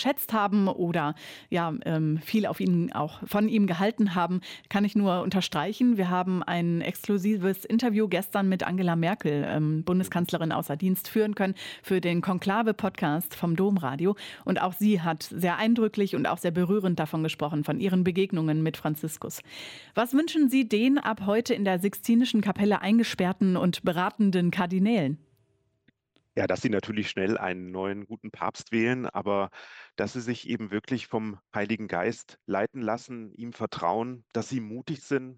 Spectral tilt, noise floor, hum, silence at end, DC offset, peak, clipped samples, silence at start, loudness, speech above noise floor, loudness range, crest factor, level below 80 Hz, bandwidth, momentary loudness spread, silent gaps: -6.5 dB/octave; -70 dBFS; none; 0.05 s; under 0.1%; -12 dBFS; under 0.1%; 0 s; -27 LUFS; 43 dB; 6 LU; 14 dB; -66 dBFS; 17.5 kHz; 9 LU; none